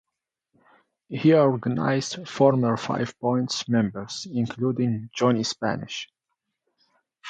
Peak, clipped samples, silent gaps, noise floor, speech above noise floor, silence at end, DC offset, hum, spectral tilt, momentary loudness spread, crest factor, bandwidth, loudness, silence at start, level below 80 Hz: -6 dBFS; under 0.1%; none; -85 dBFS; 61 dB; 0 s; under 0.1%; none; -6 dB/octave; 12 LU; 20 dB; 9.2 kHz; -24 LUFS; 1.1 s; -64 dBFS